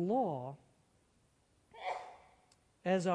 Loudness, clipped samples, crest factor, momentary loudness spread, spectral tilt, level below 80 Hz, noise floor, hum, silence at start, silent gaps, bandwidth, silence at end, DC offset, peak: -39 LUFS; under 0.1%; 18 dB; 18 LU; -6.5 dB/octave; -78 dBFS; -73 dBFS; none; 0 s; none; 10.5 kHz; 0 s; under 0.1%; -20 dBFS